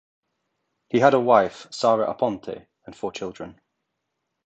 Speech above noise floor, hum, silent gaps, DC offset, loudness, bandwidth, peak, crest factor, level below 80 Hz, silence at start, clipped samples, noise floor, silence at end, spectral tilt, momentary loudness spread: 57 dB; none; none; under 0.1%; -21 LUFS; 8.8 kHz; -2 dBFS; 22 dB; -64 dBFS; 0.95 s; under 0.1%; -79 dBFS; 0.95 s; -5.5 dB/octave; 20 LU